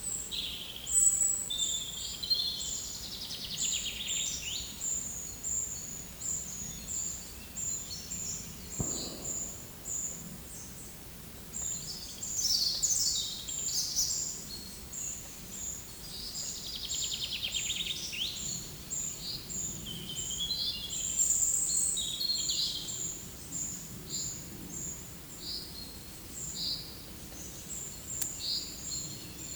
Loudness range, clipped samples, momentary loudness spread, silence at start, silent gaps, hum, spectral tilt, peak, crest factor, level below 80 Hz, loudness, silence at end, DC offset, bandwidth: 8 LU; under 0.1%; 14 LU; 0 s; none; none; -0.5 dB/octave; -12 dBFS; 24 dB; -54 dBFS; -33 LUFS; 0 s; under 0.1%; over 20 kHz